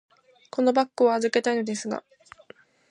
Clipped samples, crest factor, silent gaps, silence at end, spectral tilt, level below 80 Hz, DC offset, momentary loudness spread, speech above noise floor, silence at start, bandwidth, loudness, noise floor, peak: under 0.1%; 18 dB; none; 0.9 s; -4 dB/octave; -76 dBFS; under 0.1%; 12 LU; 30 dB; 0.55 s; 10.5 kHz; -25 LUFS; -53 dBFS; -8 dBFS